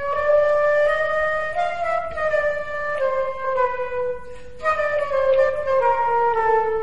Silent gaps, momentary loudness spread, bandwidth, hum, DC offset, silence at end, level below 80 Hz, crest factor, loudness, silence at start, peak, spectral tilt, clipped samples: none; 8 LU; 9.6 kHz; none; 2%; 0 s; -48 dBFS; 14 dB; -21 LUFS; 0 s; -8 dBFS; -4 dB/octave; under 0.1%